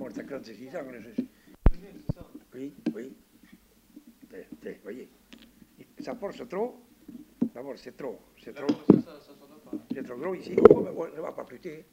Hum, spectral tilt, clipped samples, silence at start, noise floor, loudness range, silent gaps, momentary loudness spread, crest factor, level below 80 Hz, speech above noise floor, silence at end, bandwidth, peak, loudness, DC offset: none; -8.5 dB/octave; under 0.1%; 0 s; -58 dBFS; 17 LU; none; 24 LU; 28 dB; -38 dBFS; 29 dB; 0.1 s; 16 kHz; -2 dBFS; -28 LUFS; under 0.1%